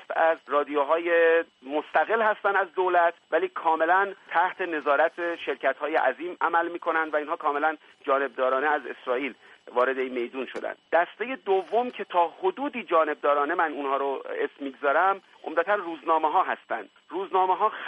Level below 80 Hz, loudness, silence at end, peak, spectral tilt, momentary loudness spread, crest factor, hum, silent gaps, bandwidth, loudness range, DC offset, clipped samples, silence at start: -82 dBFS; -26 LUFS; 0 s; -10 dBFS; -5 dB/octave; 9 LU; 16 dB; none; none; 8.2 kHz; 4 LU; under 0.1%; under 0.1%; 0 s